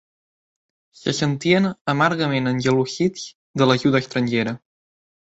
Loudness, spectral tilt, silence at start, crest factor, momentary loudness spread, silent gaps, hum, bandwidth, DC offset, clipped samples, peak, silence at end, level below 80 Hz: -20 LUFS; -5.5 dB/octave; 1.05 s; 18 dB; 10 LU; 1.81-1.85 s, 3.35-3.54 s; none; 8.2 kHz; under 0.1%; under 0.1%; -4 dBFS; 0.65 s; -58 dBFS